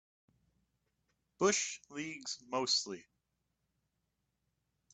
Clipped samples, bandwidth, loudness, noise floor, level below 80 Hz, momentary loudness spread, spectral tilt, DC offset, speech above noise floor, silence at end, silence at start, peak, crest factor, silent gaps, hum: under 0.1%; 9 kHz; -35 LUFS; -84 dBFS; -80 dBFS; 12 LU; -2 dB/octave; under 0.1%; 48 dB; 1.95 s; 1.4 s; -18 dBFS; 22 dB; none; none